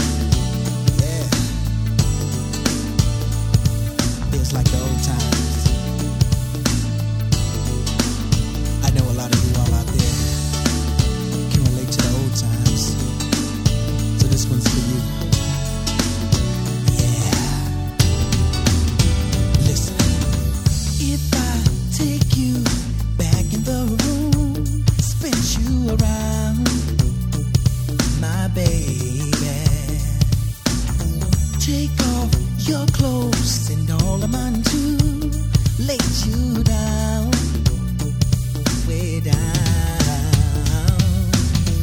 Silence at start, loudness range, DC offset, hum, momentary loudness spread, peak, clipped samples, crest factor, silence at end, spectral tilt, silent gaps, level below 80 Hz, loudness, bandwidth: 0 s; 2 LU; under 0.1%; none; 4 LU; 0 dBFS; under 0.1%; 18 dB; 0 s; -5 dB/octave; none; -24 dBFS; -19 LUFS; 17.5 kHz